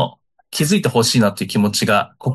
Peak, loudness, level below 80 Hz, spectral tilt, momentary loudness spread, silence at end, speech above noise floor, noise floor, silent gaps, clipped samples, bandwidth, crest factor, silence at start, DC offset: -2 dBFS; -17 LUFS; -56 dBFS; -4.5 dB/octave; 7 LU; 0 s; 20 dB; -36 dBFS; none; under 0.1%; 13 kHz; 14 dB; 0 s; under 0.1%